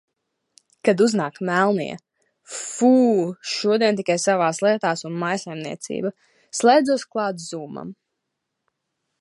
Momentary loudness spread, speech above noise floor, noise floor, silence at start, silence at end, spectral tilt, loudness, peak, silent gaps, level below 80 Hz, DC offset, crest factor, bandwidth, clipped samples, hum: 15 LU; 59 dB; -79 dBFS; 0.85 s; 1.25 s; -4.5 dB/octave; -21 LUFS; -2 dBFS; none; -72 dBFS; under 0.1%; 20 dB; 11.5 kHz; under 0.1%; none